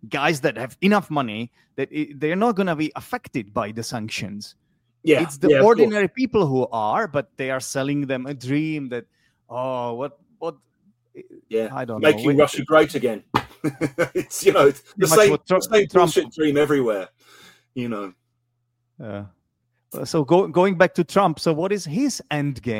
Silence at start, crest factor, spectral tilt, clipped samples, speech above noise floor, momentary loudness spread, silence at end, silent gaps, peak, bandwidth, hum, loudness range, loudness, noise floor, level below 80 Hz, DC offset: 0.05 s; 20 dB; -5 dB/octave; under 0.1%; 52 dB; 16 LU; 0 s; none; -2 dBFS; 16.5 kHz; none; 9 LU; -21 LUFS; -73 dBFS; -58 dBFS; under 0.1%